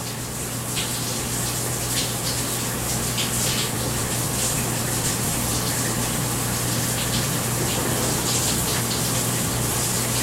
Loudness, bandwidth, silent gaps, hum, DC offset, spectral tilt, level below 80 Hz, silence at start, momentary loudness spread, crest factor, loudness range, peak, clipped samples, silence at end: -22 LUFS; 16 kHz; none; none; under 0.1%; -3 dB/octave; -40 dBFS; 0 s; 3 LU; 16 dB; 1 LU; -8 dBFS; under 0.1%; 0 s